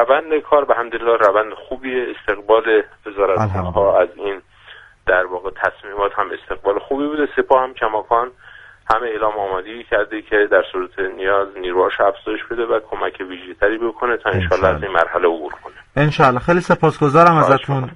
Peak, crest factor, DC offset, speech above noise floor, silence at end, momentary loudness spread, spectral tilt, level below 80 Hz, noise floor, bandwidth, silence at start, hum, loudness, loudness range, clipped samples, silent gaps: 0 dBFS; 18 dB; under 0.1%; 26 dB; 0 s; 11 LU; -7 dB/octave; -42 dBFS; -43 dBFS; 10.5 kHz; 0 s; none; -17 LUFS; 3 LU; under 0.1%; none